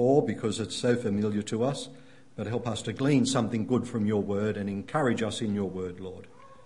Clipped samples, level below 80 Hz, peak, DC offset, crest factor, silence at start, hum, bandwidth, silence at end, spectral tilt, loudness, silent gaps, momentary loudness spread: under 0.1%; -64 dBFS; -12 dBFS; 0.2%; 18 dB; 0 s; none; 11 kHz; 0.1 s; -6 dB/octave; -29 LUFS; none; 12 LU